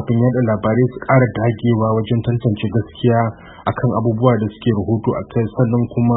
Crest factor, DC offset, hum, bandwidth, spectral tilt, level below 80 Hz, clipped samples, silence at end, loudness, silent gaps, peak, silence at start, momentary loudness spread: 16 dB; under 0.1%; none; 4 kHz; -13.5 dB/octave; -44 dBFS; under 0.1%; 0 s; -17 LUFS; none; 0 dBFS; 0 s; 5 LU